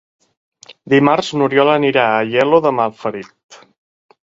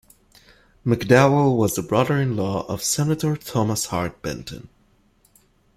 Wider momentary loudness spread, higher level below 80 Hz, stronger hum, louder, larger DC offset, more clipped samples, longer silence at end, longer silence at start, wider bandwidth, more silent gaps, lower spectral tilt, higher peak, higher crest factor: second, 10 LU vs 15 LU; second, -60 dBFS vs -52 dBFS; neither; first, -14 LUFS vs -21 LUFS; neither; neither; second, 0.75 s vs 1.2 s; about the same, 0.85 s vs 0.85 s; second, 7.8 kHz vs 16 kHz; first, 3.43-3.49 s vs none; about the same, -6 dB/octave vs -5.5 dB/octave; about the same, 0 dBFS vs -2 dBFS; second, 16 dB vs 22 dB